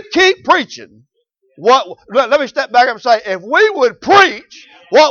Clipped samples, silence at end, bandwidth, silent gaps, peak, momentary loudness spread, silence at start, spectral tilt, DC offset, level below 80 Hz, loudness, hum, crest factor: under 0.1%; 0 s; 7.4 kHz; none; 0 dBFS; 9 LU; 0.1 s; -2.5 dB/octave; under 0.1%; -56 dBFS; -12 LUFS; none; 14 dB